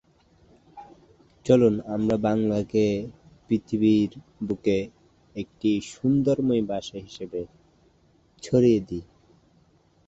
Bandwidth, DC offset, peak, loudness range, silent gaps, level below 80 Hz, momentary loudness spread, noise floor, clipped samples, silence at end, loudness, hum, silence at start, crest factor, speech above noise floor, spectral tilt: 8 kHz; under 0.1%; -6 dBFS; 4 LU; none; -54 dBFS; 17 LU; -61 dBFS; under 0.1%; 1.05 s; -24 LUFS; none; 0.75 s; 20 dB; 38 dB; -7.5 dB/octave